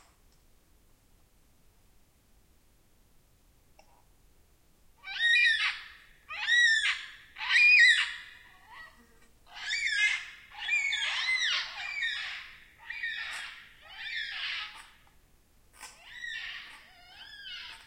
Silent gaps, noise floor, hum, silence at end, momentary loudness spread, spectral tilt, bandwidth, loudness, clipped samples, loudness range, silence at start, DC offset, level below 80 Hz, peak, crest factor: none; -63 dBFS; none; 0.05 s; 27 LU; 2.5 dB/octave; 16.5 kHz; -26 LUFS; under 0.1%; 15 LU; 5.05 s; under 0.1%; -66 dBFS; -10 dBFS; 22 dB